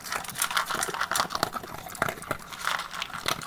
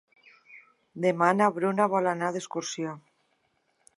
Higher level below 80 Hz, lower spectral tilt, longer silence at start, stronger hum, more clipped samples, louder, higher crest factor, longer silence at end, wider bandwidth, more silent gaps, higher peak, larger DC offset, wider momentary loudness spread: first, -56 dBFS vs -82 dBFS; second, -1.5 dB/octave vs -5 dB/octave; second, 0 s vs 0.5 s; neither; neither; second, -30 LUFS vs -27 LUFS; first, 28 dB vs 22 dB; second, 0 s vs 1 s; first, over 20 kHz vs 11.5 kHz; neither; first, -4 dBFS vs -8 dBFS; neither; second, 8 LU vs 13 LU